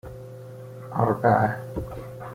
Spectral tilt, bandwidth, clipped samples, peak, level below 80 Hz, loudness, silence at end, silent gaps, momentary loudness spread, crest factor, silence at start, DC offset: -9 dB/octave; 16 kHz; under 0.1%; -6 dBFS; -48 dBFS; -24 LUFS; 0 s; none; 20 LU; 20 dB; 0.05 s; under 0.1%